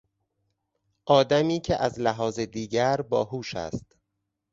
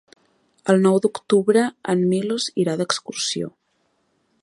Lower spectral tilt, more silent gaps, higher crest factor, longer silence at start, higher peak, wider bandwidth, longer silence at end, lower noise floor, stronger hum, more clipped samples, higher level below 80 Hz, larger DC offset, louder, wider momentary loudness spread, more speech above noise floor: about the same, -5.5 dB/octave vs -5 dB/octave; neither; about the same, 22 dB vs 20 dB; first, 1.05 s vs 0.65 s; second, -6 dBFS vs -2 dBFS; second, 7.8 kHz vs 11.5 kHz; second, 0.7 s vs 0.95 s; first, -81 dBFS vs -68 dBFS; neither; neither; first, -54 dBFS vs -70 dBFS; neither; second, -25 LUFS vs -20 LUFS; first, 12 LU vs 8 LU; first, 56 dB vs 48 dB